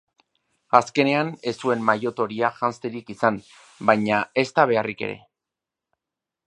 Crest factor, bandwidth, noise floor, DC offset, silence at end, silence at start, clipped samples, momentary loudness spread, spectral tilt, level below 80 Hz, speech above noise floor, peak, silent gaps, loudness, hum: 24 dB; 11 kHz; -87 dBFS; under 0.1%; 1.3 s; 0.75 s; under 0.1%; 12 LU; -5.5 dB/octave; -66 dBFS; 65 dB; 0 dBFS; none; -22 LUFS; none